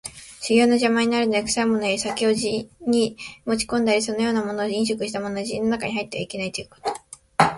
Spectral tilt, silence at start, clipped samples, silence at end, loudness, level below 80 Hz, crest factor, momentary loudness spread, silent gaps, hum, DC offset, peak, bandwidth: -4 dB/octave; 0.05 s; under 0.1%; 0 s; -23 LUFS; -56 dBFS; 22 dB; 11 LU; none; none; under 0.1%; 0 dBFS; 11.5 kHz